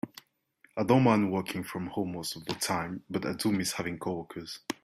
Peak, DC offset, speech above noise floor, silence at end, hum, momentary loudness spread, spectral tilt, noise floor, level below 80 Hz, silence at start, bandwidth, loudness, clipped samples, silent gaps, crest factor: -10 dBFS; under 0.1%; 36 dB; 0.1 s; none; 14 LU; -5 dB/octave; -66 dBFS; -66 dBFS; 0.05 s; 15.5 kHz; -30 LUFS; under 0.1%; none; 20 dB